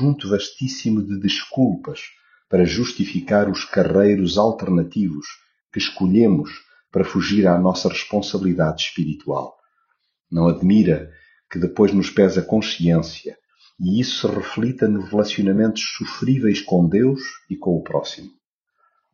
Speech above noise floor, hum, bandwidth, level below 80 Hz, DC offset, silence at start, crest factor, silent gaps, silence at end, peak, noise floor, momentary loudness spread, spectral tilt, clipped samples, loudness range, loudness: 51 dB; none; 7.2 kHz; -50 dBFS; under 0.1%; 0 s; 18 dB; none; 0.85 s; -2 dBFS; -69 dBFS; 11 LU; -6 dB/octave; under 0.1%; 2 LU; -19 LUFS